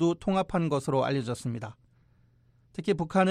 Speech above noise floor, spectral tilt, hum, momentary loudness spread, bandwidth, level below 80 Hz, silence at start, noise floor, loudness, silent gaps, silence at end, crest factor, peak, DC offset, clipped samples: 36 dB; -6.5 dB/octave; none; 12 LU; 12.5 kHz; -56 dBFS; 0 s; -63 dBFS; -29 LUFS; none; 0 s; 18 dB; -12 dBFS; under 0.1%; under 0.1%